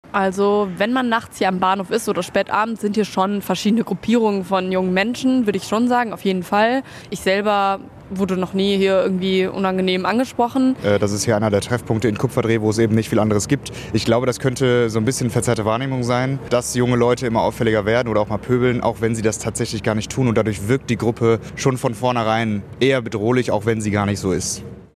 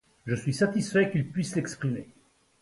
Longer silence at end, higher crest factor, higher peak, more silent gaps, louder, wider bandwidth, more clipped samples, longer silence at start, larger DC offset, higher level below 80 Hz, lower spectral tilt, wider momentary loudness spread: second, 0.1 s vs 0.6 s; about the same, 16 dB vs 18 dB; first, -2 dBFS vs -10 dBFS; neither; first, -19 LUFS vs -28 LUFS; first, 14 kHz vs 11.5 kHz; neither; second, 0.1 s vs 0.25 s; neither; first, -46 dBFS vs -62 dBFS; about the same, -5.5 dB/octave vs -6 dB/octave; second, 4 LU vs 8 LU